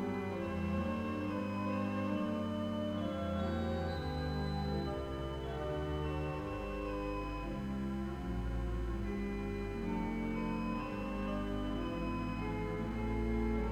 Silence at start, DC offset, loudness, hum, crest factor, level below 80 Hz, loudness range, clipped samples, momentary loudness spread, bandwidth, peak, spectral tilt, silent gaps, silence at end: 0 s; under 0.1%; -38 LUFS; none; 12 dB; -44 dBFS; 2 LU; under 0.1%; 4 LU; 13 kHz; -24 dBFS; -7.5 dB/octave; none; 0 s